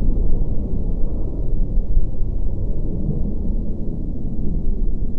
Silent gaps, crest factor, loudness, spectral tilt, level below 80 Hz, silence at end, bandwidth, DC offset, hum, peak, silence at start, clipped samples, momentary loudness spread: none; 12 dB; -26 LUFS; -12.5 dB/octave; -18 dBFS; 0 s; 1.1 kHz; under 0.1%; none; -4 dBFS; 0 s; under 0.1%; 4 LU